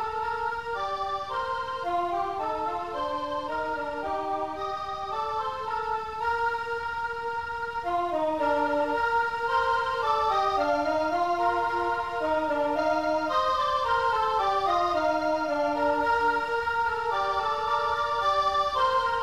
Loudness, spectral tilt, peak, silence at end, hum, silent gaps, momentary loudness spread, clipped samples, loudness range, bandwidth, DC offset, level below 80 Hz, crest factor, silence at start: -27 LUFS; -4.5 dB/octave; -14 dBFS; 0 s; none; none; 6 LU; under 0.1%; 5 LU; 13.5 kHz; 0.3%; -54 dBFS; 14 dB; 0 s